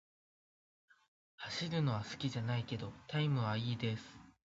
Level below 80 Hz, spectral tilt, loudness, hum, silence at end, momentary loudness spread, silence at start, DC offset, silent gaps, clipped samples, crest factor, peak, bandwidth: -68 dBFS; -5 dB/octave; -38 LUFS; none; 0.2 s; 9 LU; 1.4 s; under 0.1%; none; under 0.1%; 18 dB; -22 dBFS; 7.6 kHz